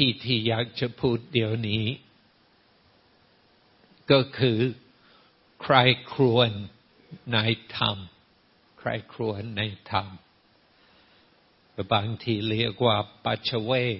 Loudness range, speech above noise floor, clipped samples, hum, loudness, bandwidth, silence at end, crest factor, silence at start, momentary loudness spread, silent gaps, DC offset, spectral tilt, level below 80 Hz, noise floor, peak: 8 LU; 37 dB; under 0.1%; none; -25 LUFS; 5.8 kHz; 0 s; 26 dB; 0 s; 17 LU; none; under 0.1%; -10 dB/octave; -60 dBFS; -62 dBFS; -2 dBFS